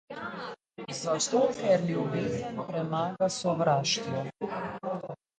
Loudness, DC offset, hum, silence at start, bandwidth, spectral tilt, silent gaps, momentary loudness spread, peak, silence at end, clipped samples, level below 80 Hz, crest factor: -30 LUFS; under 0.1%; none; 0.1 s; 9.6 kHz; -4.5 dB/octave; none; 12 LU; -14 dBFS; 0.25 s; under 0.1%; -66 dBFS; 16 dB